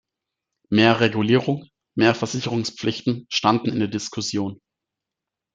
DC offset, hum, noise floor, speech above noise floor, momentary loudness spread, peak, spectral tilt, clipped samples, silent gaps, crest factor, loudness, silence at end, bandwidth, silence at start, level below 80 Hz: under 0.1%; none; -86 dBFS; 65 dB; 10 LU; -2 dBFS; -5 dB/octave; under 0.1%; none; 20 dB; -22 LUFS; 1 s; 9.2 kHz; 0.7 s; -62 dBFS